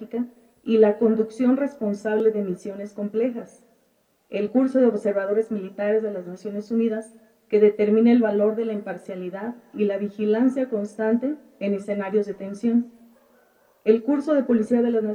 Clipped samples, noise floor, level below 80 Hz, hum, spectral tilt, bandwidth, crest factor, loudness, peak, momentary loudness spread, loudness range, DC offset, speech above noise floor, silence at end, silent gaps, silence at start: under 0.1%; -66 dBFS; -72 dBFS; none; -8 dB/octave; 9.8 kHz; 18 dB; -23 LUFS; -4 dBFS; 14 LU; 4 LU; under 0.1%; 43 dB; 0 s; none; 0 s